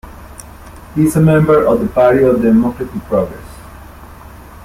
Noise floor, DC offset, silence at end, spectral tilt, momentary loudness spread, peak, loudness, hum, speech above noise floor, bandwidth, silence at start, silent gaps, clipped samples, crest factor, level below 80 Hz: -35 dBFS; under 0.1%; 0 s; -8 dB/octave; 24 LU; -2 dBFS; -13 LUFS; none; 23 dB; 16 kHz; 0.05 s; none; under 0.1%; 14 dB; -36 dBFS